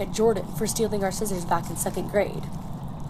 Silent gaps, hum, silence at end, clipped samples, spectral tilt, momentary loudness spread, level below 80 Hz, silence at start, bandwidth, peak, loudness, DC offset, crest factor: none; none; 0 s; under 0.1%; -5 dB/octave; 11 LU; -42 dBFS; 0 s; 16 kHz; -8 dBFS; -27 LUFS; under 0.1%; 18 dB